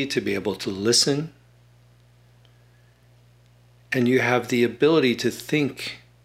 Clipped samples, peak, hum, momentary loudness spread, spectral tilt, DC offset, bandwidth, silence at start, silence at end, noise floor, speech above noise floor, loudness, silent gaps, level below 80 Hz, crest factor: under 0.1%; -4 dBFS; 60 Hz at -50 dBFS; 10 LU; -4 dB/octave; under 0.1%; 16 kHz; 0 s; 0.25 s; -55 dBFS; 33 dB; -22 LUFS; none; -62 dBFS; 20 dB